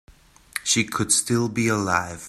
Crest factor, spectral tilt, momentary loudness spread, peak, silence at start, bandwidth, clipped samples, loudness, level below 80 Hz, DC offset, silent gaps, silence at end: 22 dB; -3 dB/octave; 6 LU; -2 dBFS; 0.55 s; 14.5 kHz; under 0.1%; -21 LUFS; -54 dBFS; under 0.1%; none; 0 s